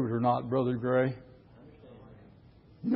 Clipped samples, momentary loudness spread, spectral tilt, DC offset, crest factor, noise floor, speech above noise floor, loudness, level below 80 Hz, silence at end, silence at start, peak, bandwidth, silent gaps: under 0.1%; 16 LU; -11.5 dB/octave; under 0.1%; 18 dB; -57 dBFS; 28 dB; -30 LUFS; -62 dBFS; 0 s; 0 s; -14 dBFS; 5.2 kHz; none